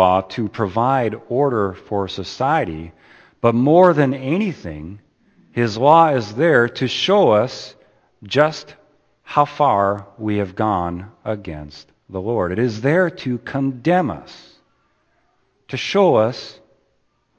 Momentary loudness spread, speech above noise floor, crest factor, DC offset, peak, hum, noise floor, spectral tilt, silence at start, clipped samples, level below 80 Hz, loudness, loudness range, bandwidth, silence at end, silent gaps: 18 LU; 47 dB; 20 dB; under 0.1%; 0 dBFS; none; -65 dBFS; -6.5 dB/octave; 0 s; under 0.1%; -52 dBFS; -18 LUFS; 5 LU; 8.4 kHz; 0.85 s; none